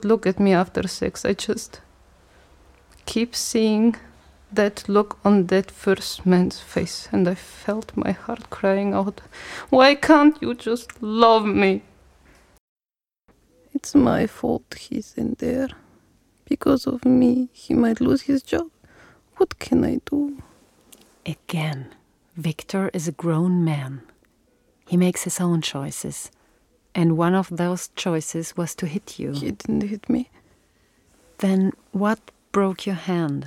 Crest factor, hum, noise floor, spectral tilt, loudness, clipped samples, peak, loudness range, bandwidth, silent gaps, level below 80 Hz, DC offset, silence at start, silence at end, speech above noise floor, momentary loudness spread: 22 dB; none; under -90 dBFS; -5.5 dB/octave; -22 LUFS; under 0.1%; 0 dBFS; 7 LU; 15.5 kHz; 12.60-12.76 s; -52 dBFS; under 0.1%; 0 s; 0 s; over 69 dB; 13 LU